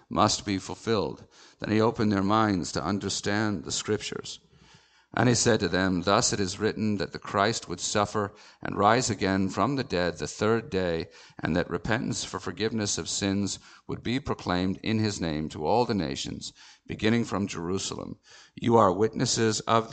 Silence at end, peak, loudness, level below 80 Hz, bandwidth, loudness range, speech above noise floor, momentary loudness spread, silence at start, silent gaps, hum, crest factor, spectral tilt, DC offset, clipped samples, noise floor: 0 s; -6 dBFS; -27 LUFS; -54 dBFS; 9.2 kHz; 3 LU; 31 dB; 12 LU; 0.1 s; none; none; 22 dB; -4.5 dB/octave; under 0.1%; under 0.1%; -58 dBFS